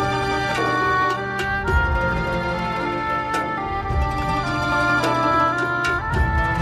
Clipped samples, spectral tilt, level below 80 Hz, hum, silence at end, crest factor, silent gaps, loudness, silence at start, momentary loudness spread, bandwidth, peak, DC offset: under 0.1%; -5.5 dB/octave; -30 dBFS; none; 0 s; 14 dB; none; -21 LUFS; 0 s; 5 LU; 15 kHz; -6 dBFS; under 0.1%